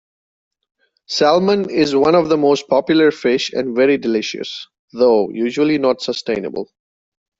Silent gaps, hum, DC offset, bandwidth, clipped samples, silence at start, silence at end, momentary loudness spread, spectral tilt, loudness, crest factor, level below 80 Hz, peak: 4.79-4.88 s; none; under 0.1%; 7.8 kHz; under 0.1%; 1.1 s; 0.75 s; 13 LU; -5 dB/octave; -16 LUFS; 14 dB; -58 dBFS; -2 dBFS